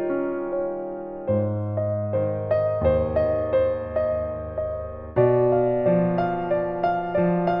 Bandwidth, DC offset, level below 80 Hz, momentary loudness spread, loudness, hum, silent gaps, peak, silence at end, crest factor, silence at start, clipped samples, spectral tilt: 5.4 kHz; under 0.1%; -46 dBFS; 9 LU; -24 LUFS; none; none; -8 dBFS; 0 s; 16 dB; 0 s; under 0.1%; -11.5 dB/octave